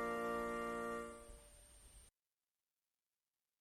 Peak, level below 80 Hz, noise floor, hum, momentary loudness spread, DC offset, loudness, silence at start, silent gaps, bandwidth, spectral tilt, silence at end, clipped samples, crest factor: -30 dBFS; -66 dBFS; under -90 dBFS; none; 21 LU; under 0.1%; -44 LUFS; 0 s; none; 15.5 kHz; -4.5 dB/octave; 1.5 s; under 0.1%; 16 dB